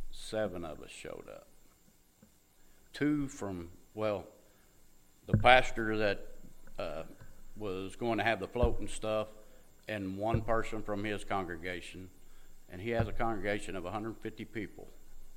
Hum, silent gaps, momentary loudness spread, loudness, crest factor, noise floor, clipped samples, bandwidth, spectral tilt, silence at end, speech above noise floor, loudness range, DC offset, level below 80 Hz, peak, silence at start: none; none; 18 LU; -35 LUFS; 30 dB; -64 dBFS; under 0.1%; 15.5 kHz; -5.5 dB/octave; 0 s; 31 dB; 8 LU; under 0.1%; -44 dBFS; -6 dBFS; 0 s